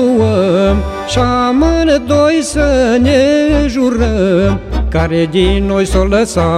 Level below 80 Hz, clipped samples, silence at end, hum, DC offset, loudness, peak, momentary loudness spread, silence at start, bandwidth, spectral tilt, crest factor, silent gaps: -20 dBFS; under 0.1%; 0 s; none; under 0.1%; -12 LUFS; 0 dBFS; 4 LU; 0 s; 13 kHz; -6 dB/octave; 10 dB; none